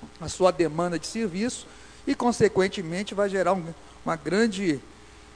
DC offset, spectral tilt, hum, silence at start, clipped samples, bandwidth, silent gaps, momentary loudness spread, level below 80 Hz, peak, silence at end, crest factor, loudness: under 0.1%; -5 dB/octave; none; 0 s; under 0.1%; 11 kHz; none; 13 LU; -52 dBFS; -6 dBFS; 0 s; 20 dB; -26 LUFS